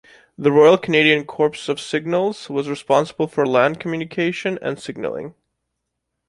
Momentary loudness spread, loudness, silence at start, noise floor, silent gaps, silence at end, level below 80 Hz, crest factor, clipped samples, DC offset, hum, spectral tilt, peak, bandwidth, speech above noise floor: 14 LU; -19 LUFS; 0.4 s; -78 dBFS; none; 1 s; -62 dBFS; 18 dB; under 0.1%; under 0.1%; none; -5.5 dB/octave; -2 dBFS; 11.5 kHz; 59 dB